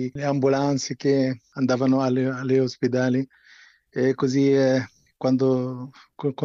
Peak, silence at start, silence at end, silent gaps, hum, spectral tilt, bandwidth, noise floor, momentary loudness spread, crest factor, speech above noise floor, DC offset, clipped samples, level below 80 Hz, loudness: -10 dBFS; 0 s; 0 s; none; none; -6.5 dB/octave; 7.6 kHz; -53 dBFS; 10 LU; 12 dB; 31 dB; under 0.1%; under 0.1%; -66 dBFS; -23 LUFS